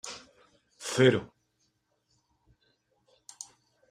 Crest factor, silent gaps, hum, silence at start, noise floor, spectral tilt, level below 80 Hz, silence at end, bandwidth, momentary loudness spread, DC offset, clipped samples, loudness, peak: 26 dB; none; none; 0.05 s; -75 dBFS; -5 dB/octave; -70 dBFS; 2.65 s; 14 kHz; 23 LU; under 0.1%; under 0.1%; -27 LUFS; -8 dBFS